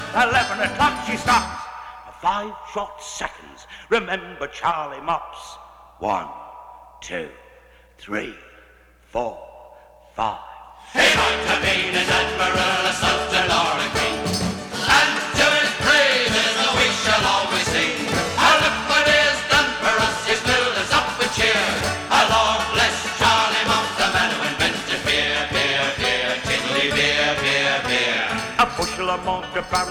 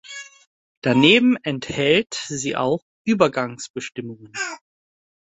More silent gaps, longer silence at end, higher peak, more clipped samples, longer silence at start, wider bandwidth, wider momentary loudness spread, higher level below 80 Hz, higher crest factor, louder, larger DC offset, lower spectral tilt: second, none vs 0.47-0.82 s, 2.82-3.05 s, 3.70-3.74 s; second, 0 s vs 0.8 s; second, -4 dBFS vs 0 dBFS; neither; about the same, 0 s vs 0.1 s; first, 19 kHz vs 8.2 kHz; second, 14 LU vs 19 LU; first, -44 dBFS vs -58 dBFS; about the same, 18 dB vs 22 dB; about the same, -19 LUFS vs -20 LUFS; neither; second, -2.5 dB/octave vs -4.5 dB/octave